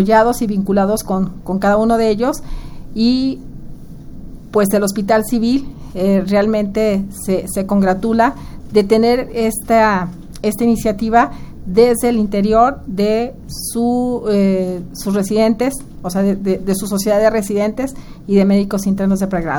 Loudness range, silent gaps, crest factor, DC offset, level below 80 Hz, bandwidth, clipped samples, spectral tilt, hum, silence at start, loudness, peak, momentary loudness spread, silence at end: 3 LU; none; 16 dB; under 0.1%; -34 dBFS; over 20 kHz; under 0.1%; -6 dB/octave; none; 0 s; -16 LUFS; 0 dBFS; 11 LU; 0 s